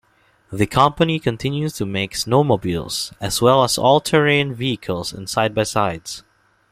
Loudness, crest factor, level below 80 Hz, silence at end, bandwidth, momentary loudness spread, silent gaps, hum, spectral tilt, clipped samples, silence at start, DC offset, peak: -19 LUFS; 18 dB; -48 dBFS; 0.5 s; 15.5 kHz; 10 LU; none; none; -4.5 dB/octave; under 0.1%; 0.5 s; under 0.1%; 0 dBFS